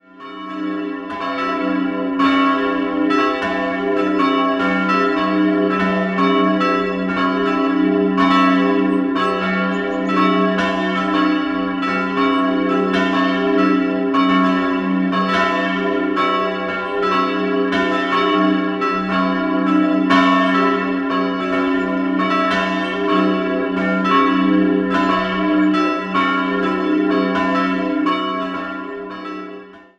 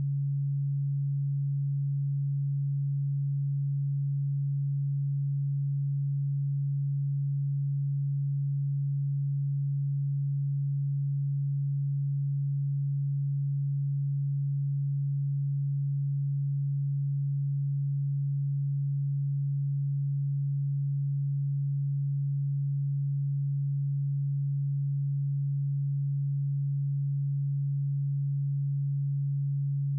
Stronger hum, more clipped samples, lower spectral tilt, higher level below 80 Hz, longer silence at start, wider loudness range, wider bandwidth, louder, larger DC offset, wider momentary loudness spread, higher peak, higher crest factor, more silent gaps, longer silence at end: neither; neither; second, -6.5 dB/octave vs -31.5 dB/octave; first, -50 dBFS vs under -90 dBFS; first, 0.15 s vs 0 s; about the same, 2 LU vs 0 LU; first, 8 kHz vs 0.2 kHz; first, -17 LUFS vs -30 LUFS; neither; first, 6 LU vs 0 LU; first, -2 dBFS vs -26 dBFS; first, 16 dB vs 4 dB; neither; first, 0.2 s vs 0 s